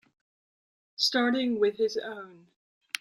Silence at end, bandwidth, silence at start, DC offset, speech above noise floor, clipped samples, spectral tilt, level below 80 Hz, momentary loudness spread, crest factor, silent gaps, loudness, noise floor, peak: 0.05 s; 16 kHz; 1 s; under 0.1%; over 62 dB; under 0.1%; -2.5 dB/octave; -78 dBFS; 20 LU; 20 dB; 2.56-2.81 s; -27 LUFS; under -90 dBFS; -12 dBFS